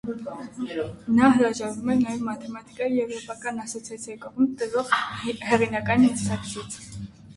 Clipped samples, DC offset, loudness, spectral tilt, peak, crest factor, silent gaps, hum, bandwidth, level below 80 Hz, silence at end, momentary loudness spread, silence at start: under 0.1%; under 0.1%; -25 LUFS; -5 dB/octave; -6 dBFS; 20 dB; none; none; 11.5 kHz; -54 dBFS; 0.05 s; 16 LU; 0.05 s